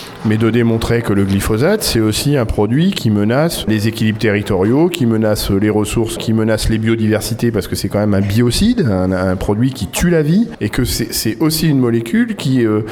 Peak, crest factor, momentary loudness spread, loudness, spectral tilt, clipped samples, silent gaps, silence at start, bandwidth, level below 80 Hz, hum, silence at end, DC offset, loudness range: 0 dBFS; 14 dB; 4 LU; -15 LUFS; -5.5 dB/octave; under 0.1%; none; 0 s; 19 kHz; -30 dBFS; none; 0 s; under 0.1%; 1 LU